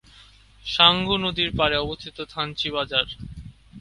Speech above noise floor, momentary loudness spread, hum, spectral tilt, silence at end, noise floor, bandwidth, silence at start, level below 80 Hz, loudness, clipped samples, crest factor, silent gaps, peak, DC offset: 28 dB; 18 LU; none; -5 dB/octave; 0 s; -51 dBFS; 11.5 kHz; 0.65 s; -44 dBFS; -21 LUFS; under 0.1%; 24 dB; none; 0 dBFS; under 0.1%